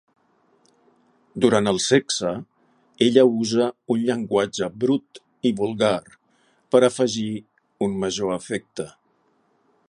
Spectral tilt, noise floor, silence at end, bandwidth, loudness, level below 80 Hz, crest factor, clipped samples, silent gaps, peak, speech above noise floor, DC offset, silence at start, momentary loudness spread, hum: -4.5 dB/octave; -65 dBFS; 1 s; 11 kHz; -22 LUFS; -62 dBFS; 22 dB; under 0.1%; none; -2 dBFS; 44 dB; under 0.1%; 1.35 s; 12 LU; none